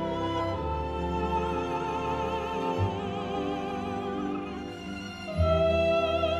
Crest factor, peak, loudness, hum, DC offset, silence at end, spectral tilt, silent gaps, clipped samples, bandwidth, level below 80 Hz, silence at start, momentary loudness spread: 16 dB; -14 dBFS; -30 LUFS; none; under 0.1%; 0 s; -7 dB/octave; none; under 0.1%; 12 kHz; -42 dBFS; 0 s; 11 LU